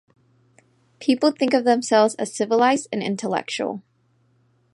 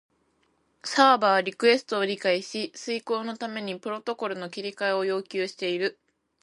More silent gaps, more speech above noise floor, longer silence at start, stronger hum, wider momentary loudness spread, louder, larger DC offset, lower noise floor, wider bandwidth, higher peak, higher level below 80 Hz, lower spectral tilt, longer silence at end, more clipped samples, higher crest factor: neither; about the same, 43 dB vs 43 dB; first, 1 s vs 0.85 s; neither; second, 9 LU vs 12 LU; first, -21 LUFS vs -26 LUFS; neither; second, -63 dBFS vs -69 dBFS; about the same, 11.5 kHz vs 11.5 kHz; about the same, -4 dBFS vs -6 dBFS; about the same, -76 dBFS vs -80 dBFS; about the same, -4 dB/octave vs -3.5 dB/octave; first, 0.95 s vs 0.5 s; neither; about the same, 18 dB vs 22 dB